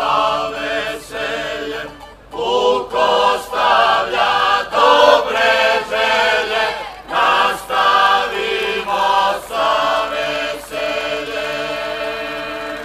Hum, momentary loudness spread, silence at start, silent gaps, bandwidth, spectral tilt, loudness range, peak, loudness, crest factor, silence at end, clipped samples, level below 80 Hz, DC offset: none; 11 LU; 0 s; none; 15.5 kHz; -2 dB/octave; 5 LU; 0 dBFS; -16 LUFS; 16 dB; 0 s; under 0.1%; -48 dBFS; under 0.1%